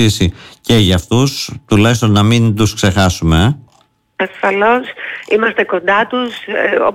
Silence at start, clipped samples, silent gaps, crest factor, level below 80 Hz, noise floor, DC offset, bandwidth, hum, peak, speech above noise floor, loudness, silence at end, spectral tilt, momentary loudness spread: 0 s; under 0.1%; none; 10 dB; -32 dBFS; -54 dBFS; under 0.1%; 16 kHz; none; -2 dBFS; 41 dB; -13 LUFS; 0 s; -5.5 dB/octave; 10 LU